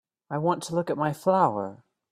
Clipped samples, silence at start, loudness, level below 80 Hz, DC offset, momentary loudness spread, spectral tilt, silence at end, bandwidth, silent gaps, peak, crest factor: under 0.1%; 0.3 s; -26 LUFS; -70 dBFS; under 0.1%; 12 LU; -6.5 dB/octave; 0.35 s; 15 kHz; none; -8 dBFS; 18 dB